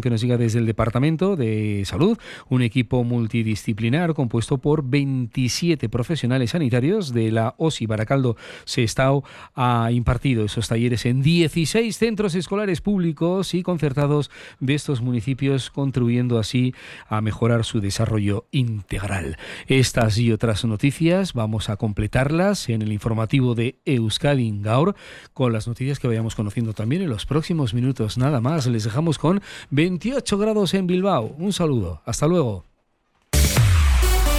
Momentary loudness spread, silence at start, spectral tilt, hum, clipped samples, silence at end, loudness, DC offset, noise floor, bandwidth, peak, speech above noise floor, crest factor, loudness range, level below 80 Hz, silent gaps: 6 LU; 0 s; -6 dB/octave; none; under 0.1%; 0 s; -21 LUFS; under 0.1%; -66 dBFS; 16 kHz; -6 dBFS; 45 dB; 14 dB; 2 LU; -32 dBFS; none